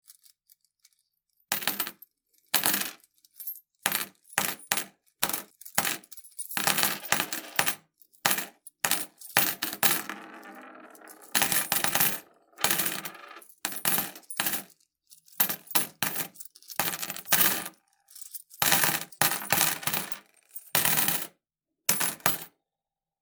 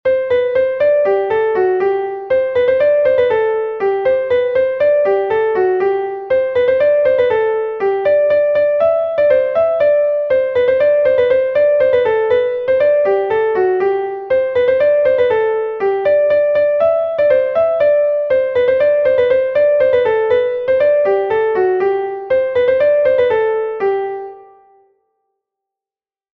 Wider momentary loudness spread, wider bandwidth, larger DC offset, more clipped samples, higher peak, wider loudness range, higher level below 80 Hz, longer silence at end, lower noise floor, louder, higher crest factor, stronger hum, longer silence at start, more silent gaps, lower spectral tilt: first, 17 LU vs 5 LU; first, over 20 kHz vs 5.2 kHz; neither; neither; about the same, -2 dBFS vs -2 dBFS; first, 5 LU vs 2 LU; second, -72 dBFS vs -52 dBFS; second, 0.75 s vs 1.9 s; about the same, under -90 dBFS vs under -90 dBFS; second, -26 LUFS vs -14 LUFS; first, 30 dB vs 12 dB; neither; first, 1.5 s vs 0.05 s; neither; second, -0.5 dB/octave vs -7 dB/octave